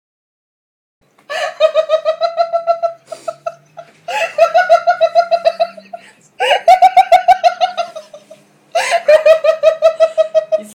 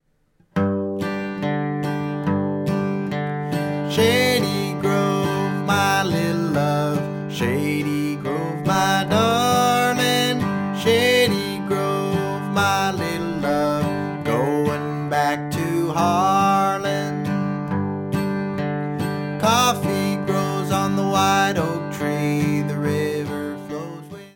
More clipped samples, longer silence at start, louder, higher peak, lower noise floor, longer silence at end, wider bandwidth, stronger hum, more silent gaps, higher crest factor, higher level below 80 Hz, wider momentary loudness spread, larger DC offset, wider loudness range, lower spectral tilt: neither; first, 1.3 s vs 0.55 s; first, -13 LUFS vs -21 LUFS; first, 0 dBFS vs -4 dBFS; second, -44 dBFS vs -61 dBFS; about the same, 0.05 s vs 0.05 s; second, 13.5 kHz vs 17.5 kHz; neither; neither; about the same, 14 dB vs 16 dB; second, -60 dBFS vs -54 dBFS; first, 17 LU vs 8 LU; neither; first, 6 LU vs 3 LU; second, -1 dB/octave vs -5 dB/octave